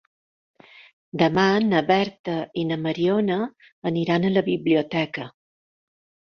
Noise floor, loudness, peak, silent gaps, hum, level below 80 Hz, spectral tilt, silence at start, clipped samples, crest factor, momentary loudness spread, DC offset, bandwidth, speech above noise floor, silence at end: under -90 dBFS; -23 LUFS; -4 dBFS; 2.19-2.24 s, 3.72-3.82 s; none; -62 dBFS; -7 dB/octave; 1.15 s; under 0.1%; 20 dB; 11 LU; under 0.1%; 6.6 kHz; over 68 dB; 1 s